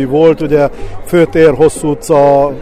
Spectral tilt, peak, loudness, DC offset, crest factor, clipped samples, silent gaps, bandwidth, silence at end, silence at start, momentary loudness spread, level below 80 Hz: -6.5 dB/octave; 0 dBFS; -10 LUFS; under 0.1%; 10 dB; 0.3%; none; 15 kHz; 0 s; 0 s; 8 LU; -30 dBFS